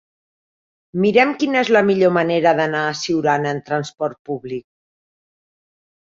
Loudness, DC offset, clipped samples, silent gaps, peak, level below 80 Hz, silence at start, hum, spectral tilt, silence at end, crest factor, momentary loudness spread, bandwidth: -18 LUFS; under 0.1%; under 0.1%; 4.19-4.25 s; -2 dBFS; -62 dBFS; 0.95 s; none; -5.5 dB/octave; 1.5 s; 18 dB; 13 LU; 7.8 kHz